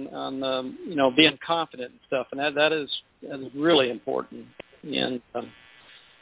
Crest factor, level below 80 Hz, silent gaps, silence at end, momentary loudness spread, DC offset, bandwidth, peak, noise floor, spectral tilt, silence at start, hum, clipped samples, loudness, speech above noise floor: 22 dB; -66 dBFS; none; 0.25 s; 19 LU; under 0.1%; 4 kHz; -4 dBFS; -53 dBFS; -8.5 dB/octave; 0 s; none; under 0.1%; -25 LUFS; 27 dB